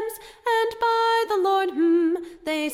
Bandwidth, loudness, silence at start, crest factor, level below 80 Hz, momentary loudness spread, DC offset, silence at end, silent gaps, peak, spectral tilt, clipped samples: 16 kHz; -22 LUFS; 0 s; 10 dB; -62 dBFS; 9 LU; under 0.1%; 0 s; none; -12 dBFS; -2.5 dB/octave; under 0.1%